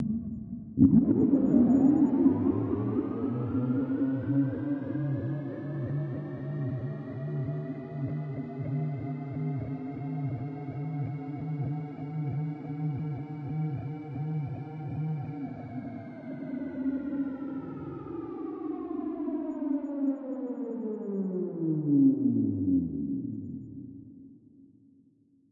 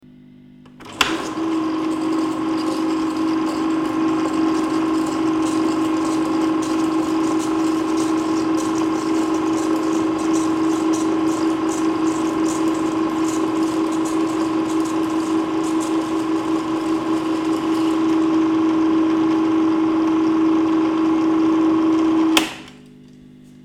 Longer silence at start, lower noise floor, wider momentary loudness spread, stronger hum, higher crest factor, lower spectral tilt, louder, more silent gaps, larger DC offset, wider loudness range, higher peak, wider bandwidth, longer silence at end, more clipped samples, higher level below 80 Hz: second, 0 s vs 0.8 s; first, -64 dBFS vs -45 dBFS; first, 15 LU vs 4 LU; neither; about the same, 22 dB vs 18 dB; first, -12 dB/octave vs -4.5 dB/octave; second, -31 LUFS vs -19 LUFS; neither; neither; first, 10 LU vs 3 LU; second, -8 dBFS vs -2 dBFS; second, 3.3 kHz vs 13.5 kHz; first, 0.85 s vs 0.35 s; neither; second, -60 dBFS vs -54 dBFS